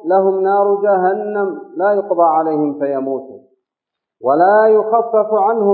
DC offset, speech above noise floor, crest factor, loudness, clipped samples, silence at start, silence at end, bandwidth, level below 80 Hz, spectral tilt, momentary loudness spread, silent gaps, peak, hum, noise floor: under 0.1%; 69 dB; 14 dB; -15 LUFS; under 0.1%; 0.05 s; 0 s; 4.4 kHz; -80 dBFS; -12.5 dB/octave; 9 LU; none; 0 dBFS; none; -82 dBFS